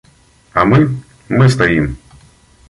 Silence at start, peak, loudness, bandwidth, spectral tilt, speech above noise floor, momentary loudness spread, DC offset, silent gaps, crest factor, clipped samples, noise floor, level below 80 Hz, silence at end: 0.55 s; -2 dBFS; -13 LUFS; 11.5 kHz; -7 dB/octave; 38 dB; 13 LU; under 0.1%; none; 14 dB; under 0.1%; -49 dBFS; -36 dBFS; 0.75 s